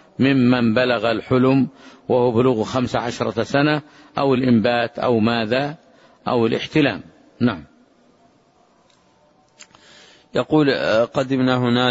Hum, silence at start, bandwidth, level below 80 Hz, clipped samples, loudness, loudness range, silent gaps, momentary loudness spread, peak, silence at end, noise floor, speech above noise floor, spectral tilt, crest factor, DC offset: none; 0.2 s; 8 kHz; -54 dBFS; under 0.1%; -19 LUFS; 7 LU; none; 9 LU; -4 dBFS; 0 s; -57 dBFS; 38 dB; -7 dB/octave; 16 dB; under 0.1%